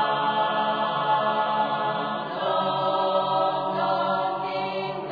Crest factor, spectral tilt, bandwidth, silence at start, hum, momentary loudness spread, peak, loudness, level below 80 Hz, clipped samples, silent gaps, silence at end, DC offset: 14 dB; -7 dB/octave; 5 kHz; 0 s; none; 5 LU; -12 dBFS; -25 LUFS; -68 dBFS; under 0.1%; none; 0 s; under 0.1%